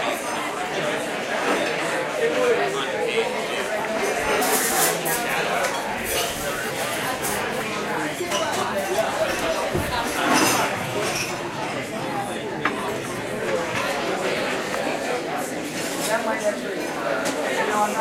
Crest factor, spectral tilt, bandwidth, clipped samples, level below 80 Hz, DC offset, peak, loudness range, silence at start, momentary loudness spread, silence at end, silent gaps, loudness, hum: 18 dB; -2.5 dB/octave; 16 kHz; under 0.1%; -52 dBFS; under 0.1%; -6 dBFS; 3 LU; 0 s; 7 LU; 0 s; none; -23 LUFS; none